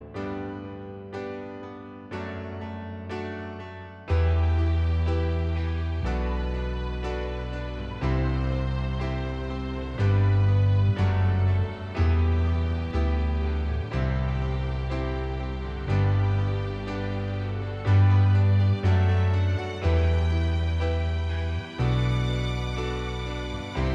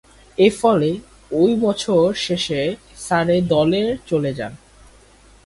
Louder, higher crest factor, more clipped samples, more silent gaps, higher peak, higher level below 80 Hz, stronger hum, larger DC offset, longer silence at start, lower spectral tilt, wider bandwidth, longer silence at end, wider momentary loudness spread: second, -26 LUFS vs -18 LUFS; about the same, 14 dB vs 18 dB; neither; neither; second, -12 dBFS vs -2 dBFS; first, -32 dBFS vs -48 dBFS; neither; neither; second, 0 s vs 0.4 s; first, -8 dB/octave vs -5.5 dB/octave; second, 7 kHz vs 11.5 kHz; second, 0 s vs 0.9 s; about the same, 14 LU vs 12 LU